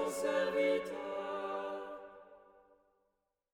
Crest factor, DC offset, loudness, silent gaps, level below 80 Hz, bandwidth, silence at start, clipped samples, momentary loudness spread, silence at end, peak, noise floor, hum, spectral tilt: 16 dB; under 0.1%; -36 LUFS; none; -74 dBFS; 18 kHz; 0 s; under 0.1%; 18 LU; 1.15 s; -22 dBFS; -83 dBFS; none; -3.5 dB/octave